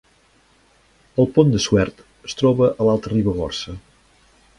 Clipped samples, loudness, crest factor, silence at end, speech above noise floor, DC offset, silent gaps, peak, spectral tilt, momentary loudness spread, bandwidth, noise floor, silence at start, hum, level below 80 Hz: under 0.1%; -19 LUFS; 20 dB; 0.8 s; 39 dB; under 0.1%; none; -2 dBFS; -6 dB/octave; 16 LU; 11.5 kHz; -57 dBFS; 1.15 s; none; -44 dBFS